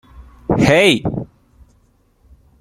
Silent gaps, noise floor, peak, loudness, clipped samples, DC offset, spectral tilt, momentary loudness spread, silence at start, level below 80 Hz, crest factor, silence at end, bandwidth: none; -56 dBFS; 0 dBFS; -14 LUFS; under 0.1%; under 0.1%; -5 dB/octave; 20 LU; 0.2 s; -42 dBFS; 18 dB; 1.35 s; 15.5 kHz